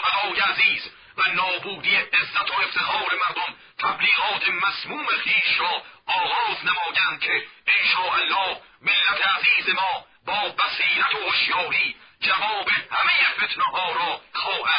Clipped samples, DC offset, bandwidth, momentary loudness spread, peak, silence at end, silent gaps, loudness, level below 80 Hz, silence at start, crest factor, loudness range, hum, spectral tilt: under 0.1%; under 0.1%; 5.4 kHz; 8 LU; -6 dBFS; 0 s; none; -21 LUFS; -64 dBFS; 0 s; 16 dB; 2 LU; none; -5.5 dB/octave